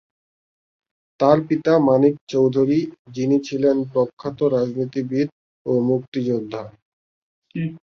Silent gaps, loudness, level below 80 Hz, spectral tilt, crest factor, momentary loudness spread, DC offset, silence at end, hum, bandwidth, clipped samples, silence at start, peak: 2.21-2.27 s, 2.99-3.05 s, 4.13-4.17 s, 5.32-5.65 s, 6.08-6.12 s, 6.82-7.42 s; -20 LUFS; -62 dBFS; -8 dB/octave; 18 dB; 12 LU; under 0.1%; 0.15 s; none; 6.8 kHz; under 0.1%; 1.2 s; -2 dBFS